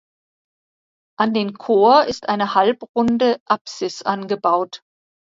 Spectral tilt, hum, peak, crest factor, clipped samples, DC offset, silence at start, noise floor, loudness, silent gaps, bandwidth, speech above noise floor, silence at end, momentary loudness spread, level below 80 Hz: -5 dB/octave; none; 0 dBFS; 18 dB; under 0.1%; under 0.1%; 1.2 s; under -90 dBFS; -18 LUFS; 2.89-2.94 s, 3.40-3.46 s, 3.61-3.65 s; 7.8 kHz; over 72 dB; 0.55 s; 11 LU; -60 dBFS